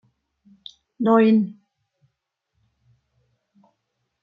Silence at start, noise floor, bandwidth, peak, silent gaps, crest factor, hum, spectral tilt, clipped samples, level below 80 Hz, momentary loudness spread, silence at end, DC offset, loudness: 1 s; -78 dBFS; 5 kHz; -4 dBFS; none; 22 dB; none; -9 dB/octave; under 0.1%; -74 dBFS; 27 LU; 2.7 s; under 0.1%; -19 LUFS